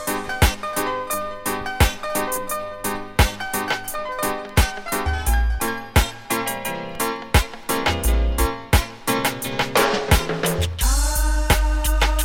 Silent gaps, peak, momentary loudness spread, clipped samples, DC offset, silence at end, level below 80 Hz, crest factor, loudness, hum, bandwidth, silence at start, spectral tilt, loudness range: none; -2 dBFS; 6 LU; under 0.1%; under 0.1%; 0 s; -24 dBFS; 18 dB; -22 LUFS; none; 17 kHz; 0 s; -4 dB/octave; 3 LU